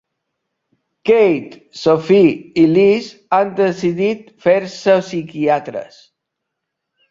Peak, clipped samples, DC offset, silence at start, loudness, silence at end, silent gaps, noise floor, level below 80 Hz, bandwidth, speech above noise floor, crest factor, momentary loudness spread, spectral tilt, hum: -2 dBFS; under 0.1%; under 0.1%; 1.05 s; -15 LUFS; 1.25 s; none; -78 dBFS; -58 dBFS; 7.6 kHz; 63 dB; 14 dB; 11 LU; -6.5 dB/octave; none